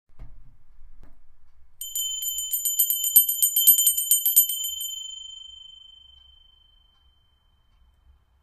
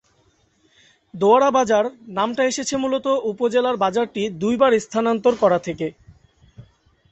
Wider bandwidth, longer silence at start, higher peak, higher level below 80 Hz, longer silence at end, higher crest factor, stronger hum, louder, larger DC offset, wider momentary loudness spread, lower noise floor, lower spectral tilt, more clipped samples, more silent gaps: first, 16 kHz vs 8.4 kHz; second, 0.1 s vs 1.15 s; about the same, -2 dBFS vs -2 dBFS; about the same, -54 dBFS vs -58 dBFS; first, 2.65 s vs 0.5 s; first, 24 dB vs 18 dB; neither; about the same, -19 LUFS vs -20 LUFS; neither; first, 22 LU vs 8 LU; about the same, -63 dBFS vs -61 dBFS; second, 4 dB/octave vs -4.5 dB/octave; neither; neither